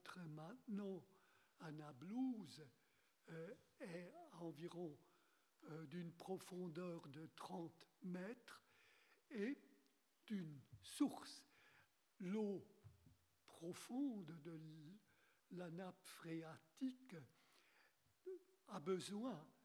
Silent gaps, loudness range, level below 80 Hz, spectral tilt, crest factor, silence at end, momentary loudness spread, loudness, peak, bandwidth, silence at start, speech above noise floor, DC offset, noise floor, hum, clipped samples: none; 5 LU; under -90 dBFS; -6 dB/octave; 22 dB; 0.15 s; 15 LU; -53 LUFS; -30 dBFS; 18 kHz; 0.05 s; 29 dB; under 0.1%; -81 dBFS; none; under 0.1%